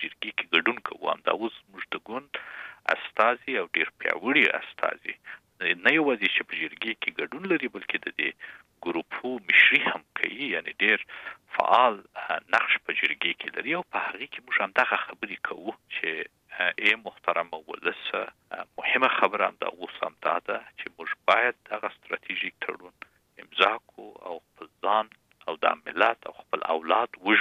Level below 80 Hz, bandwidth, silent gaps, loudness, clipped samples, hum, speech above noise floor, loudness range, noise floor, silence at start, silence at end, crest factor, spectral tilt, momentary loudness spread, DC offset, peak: -76 dBFS; 14 kHz; none; -26 LUFS; under 0.1%; none; 25 dB; 5 LU; -53 dBFS; 0 s; 0 s; 24 dB; -4.5 dB/octave; 16 LU; under 0.1%; -4 dBFS